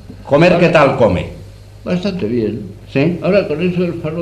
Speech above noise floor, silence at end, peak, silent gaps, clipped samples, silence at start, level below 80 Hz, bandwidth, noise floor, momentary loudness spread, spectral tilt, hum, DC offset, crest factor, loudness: 21 dB; 0 s; 0 dBFS; none; under 0.1%; 0.05 s; -40 dBFS; 9.6 kHz; -35 dBFS; 12 LU; -7.5 dB/octave; none; under 0.1%; 14 dB; -14 LUFS